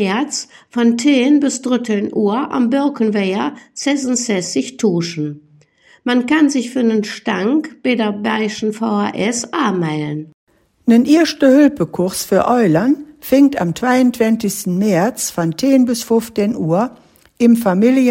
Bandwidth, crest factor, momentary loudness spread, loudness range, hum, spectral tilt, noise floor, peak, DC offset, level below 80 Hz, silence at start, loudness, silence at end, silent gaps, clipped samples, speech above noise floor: 16.5 kHz; 14 dB; 8 LU; 4 LU; none; -5 dB/octave; -50 dBFS; 0 dBFS; under 0.1%; -56 dBFS; 0 s; -16 LUFS; 0 s; 10.34-10.47 s; under 0.1%; 35 dB